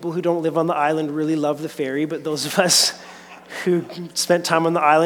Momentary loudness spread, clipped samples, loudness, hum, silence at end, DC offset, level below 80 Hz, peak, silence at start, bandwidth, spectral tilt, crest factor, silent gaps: 11 LU; under 0.1%; -20 LUFS; none; 0 s; under 0.1%; -70 dBFS; -2 dBFS; 0 s; 19 kHz; -3.5 dB/octave; 18 dB; none